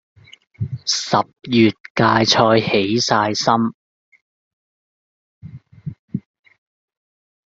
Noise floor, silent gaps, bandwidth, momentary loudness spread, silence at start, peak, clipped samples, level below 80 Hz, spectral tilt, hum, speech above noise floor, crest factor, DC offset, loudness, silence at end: under -90 dBFS; 1.80-1.84 s, 1.90-1.95 s, 3.74-4.12 s, 4.21-5.41 s, 5.99-6.08 s; 7.8 kHz; 18 LU; 0.6 s; -2 dBFS; under 0.1%; -56 dBFS; -4.5 dB/octave; none; over 73 dB; 20 dB; under 0.1%; -17 LUFS; 1.25 s